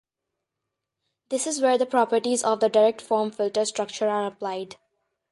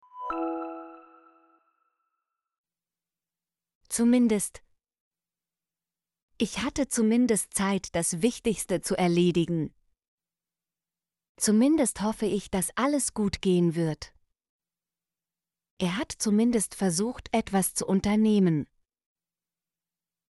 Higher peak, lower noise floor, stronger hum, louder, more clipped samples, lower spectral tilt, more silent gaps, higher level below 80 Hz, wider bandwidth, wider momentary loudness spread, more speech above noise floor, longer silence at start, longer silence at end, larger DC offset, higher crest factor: first, -8 dBFS vs -12 dBFS; second, -84 dBFS vs under -90 dBFS; neither; about the same, -24 LUFS vs -26 LUFS; neither; second, -3 dB/octave vs -5 dB/octave; second, none vs 2.58-2.64 s, 3.75-3.81 s, 5.00-5.11 s, 6.22-6.28 s, 10.08-10.18 s, 11.29-11.35 s, 14.49-14.59 s, 15.71-15.77 s; second, -76 dBFS vs -56 dBFS; about the same, 11.5 kHz vs 12 kHz; about the same, 11 LU vs 10 LU; second, 61 dB vs over 65 dB; first, 1.3 s vs 0.15 s; second, 0.6 s vs 1.65 s; neither; about the same, 18 dB vs 18 dB